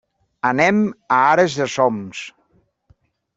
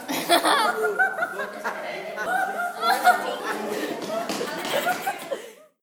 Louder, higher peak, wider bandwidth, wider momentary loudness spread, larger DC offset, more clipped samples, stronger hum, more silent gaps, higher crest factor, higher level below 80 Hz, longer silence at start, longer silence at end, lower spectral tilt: first, -17 LUFS vs -24 LUFS; about the same, -2 dBFS vs -4 dBFS; second, 8 kHz vs 20 kHz; first, 16 LU vs 12 LU; neither; neither; neither; neither; about the same, 18 dB vs 20 dB; first, -60 dBFS vs -76 dBFS; first, 0.45 s vs 0 s; first, 1.05 s vs 0.25 s; first, -5 dB/octave vs -2 dB/octave